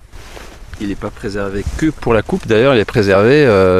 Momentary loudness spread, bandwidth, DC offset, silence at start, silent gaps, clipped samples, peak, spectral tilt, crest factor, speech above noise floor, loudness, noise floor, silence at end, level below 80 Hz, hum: 17 LU; 13.5 kHz; 0.2%; 0.15 s; none; under 0.1%; 0 dBFS; -6.5 dB/octave; 14 dB; 20 dB; -14 LUFS; -33 dBFS; 0 s; -32 dBFS; none